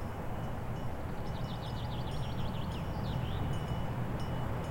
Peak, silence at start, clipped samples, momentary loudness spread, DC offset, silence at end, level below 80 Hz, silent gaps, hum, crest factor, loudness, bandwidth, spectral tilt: -24 dBFS; 0 s; under 0.1%; 4 LU; under 0.1%; 0 s; -44 dBFS; none; none; 12 dB; -38 LUFS; 16.5 kHz; -7 dB/octave